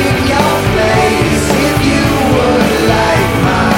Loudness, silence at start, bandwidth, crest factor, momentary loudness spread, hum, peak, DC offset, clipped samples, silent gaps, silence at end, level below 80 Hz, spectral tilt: -11 LUFS; 0 s; 17 kHz; 10 dB; 1 LU; none; 0 dBFS; under 0.1%; under 0.1%; none; 0 s; -26 dBFS; -5 dB/octave